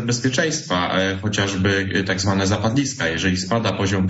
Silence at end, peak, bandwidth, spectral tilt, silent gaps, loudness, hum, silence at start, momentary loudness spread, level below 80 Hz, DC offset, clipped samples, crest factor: 0 s; -6 dBFS; 8 kHz; -4.5 dB/octave; none; -20 LUFS; none; 0 s; 2 LU; -48 dBFS; under 0.1%; under 0.1%; 14 dB